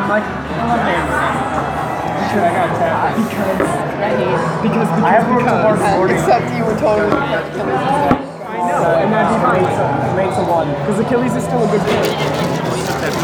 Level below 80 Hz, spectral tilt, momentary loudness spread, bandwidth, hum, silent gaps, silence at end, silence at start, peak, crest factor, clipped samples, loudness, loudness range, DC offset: -40 dBFS; -6 dB/octave; 5 LU; 20 kHz; none; none; 0 s; 0 s; 0 dBFS; 14 dB; under 0.1%; -16 LUFS; 2 LU; under 0.1%